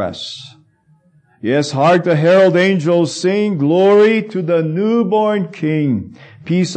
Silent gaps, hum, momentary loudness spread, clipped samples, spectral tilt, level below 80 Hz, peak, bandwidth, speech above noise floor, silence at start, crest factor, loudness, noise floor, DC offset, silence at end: none; none; 14 LU; under 0.1%; -6.5 dB/octave; -62 dBFS; -2 dBFS; 9 kHz; 40 dB; 0 s; 12 dB; -14 LUFS; -54 dBFS; under 0.1%; 0 s